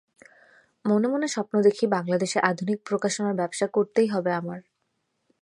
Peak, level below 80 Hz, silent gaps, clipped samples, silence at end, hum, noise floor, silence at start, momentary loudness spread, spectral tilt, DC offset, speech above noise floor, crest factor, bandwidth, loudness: -4 dBFS; -76 dBFS; none; under 0.1%; 0.8 s; none; -76 dBFS; 0.85 s; 7 LU; -5 dB/octave; under 0.1%; 52 dB; 20 dB; 11.5 kHz; -25 LUFS